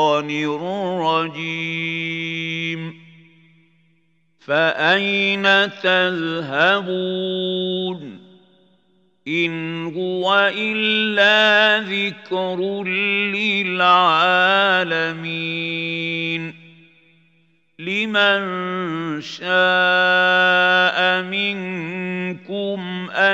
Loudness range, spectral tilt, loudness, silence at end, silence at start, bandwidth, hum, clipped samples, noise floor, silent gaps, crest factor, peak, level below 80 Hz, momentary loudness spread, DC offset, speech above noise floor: 8 LU; -5 dB/octave; -18 LUFS; 0 s; 0 s; 16 kHz; none; under 0.1%; -64 dBFS; none; 18 dB; -2 dBFS; -78 dBFS; 12 LU; under 0.1%; 45 dB